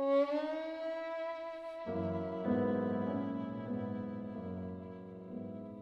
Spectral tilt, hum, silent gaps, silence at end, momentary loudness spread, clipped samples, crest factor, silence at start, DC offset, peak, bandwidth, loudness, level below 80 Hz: -9 dB/octave; none; none; 0 s; 12 LU; under 0.1%; 16 dB; 0 s; under 0.1%; -20 dBFS; 7 kHz; -38 LUFS; -74 dBFS